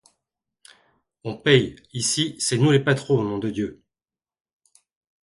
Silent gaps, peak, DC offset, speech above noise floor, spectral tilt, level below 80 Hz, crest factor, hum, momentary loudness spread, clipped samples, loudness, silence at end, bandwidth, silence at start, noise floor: none; -2 dBFS; under 0.1%; over 69 dB; -4.5 dB/octave; -58 dBFS; 22 dB; none; 13 LU; under 0.1%; -22 LUFS; 1.5 s; 11.5 kHz; 1.25 s; under -90 dBFS